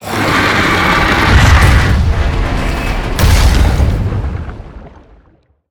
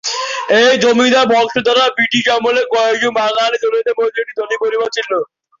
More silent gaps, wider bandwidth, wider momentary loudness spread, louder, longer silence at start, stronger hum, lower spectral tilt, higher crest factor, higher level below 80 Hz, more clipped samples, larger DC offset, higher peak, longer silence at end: neither; first, over 20 kHz vs 7.6 kHz; about the same, 11 LU vs 9 LU; about the same, -11 LUFS vs -13 LUFS; about the same, 0 s vs 0.05 s; neither; first, -5 dB/octave vs -2.5 dB/octave; about the same, 12 dB vs 12 dB; first, -14 dBFS vs -58 dBFS; neither; neither; about the same, 0 dBFS vs -2 dBFS; first, 0.8 s vs 0.35 s